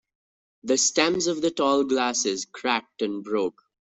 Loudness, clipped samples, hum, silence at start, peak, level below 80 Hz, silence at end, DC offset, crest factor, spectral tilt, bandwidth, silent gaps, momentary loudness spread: -24 LUFS; under 0.1%; none; 0.65 s; -4 dBFS; -66 dBFS; 0.4 s; under 0.1%; 22 dB; -2 dB/octave; 8.4 kHz; none; 9 LU